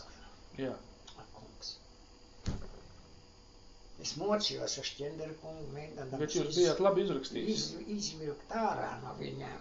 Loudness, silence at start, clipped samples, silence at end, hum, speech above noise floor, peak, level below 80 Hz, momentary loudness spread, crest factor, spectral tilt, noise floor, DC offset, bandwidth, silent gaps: -36 LUFS; 0 s; under 0.1%; 0 s; none; 22 dB; -14 dBFS; -56 dBFS; 23 LU; 22 dB; -4 dB/octave; -57 dBFS; under 0.1%; 8 kHz; none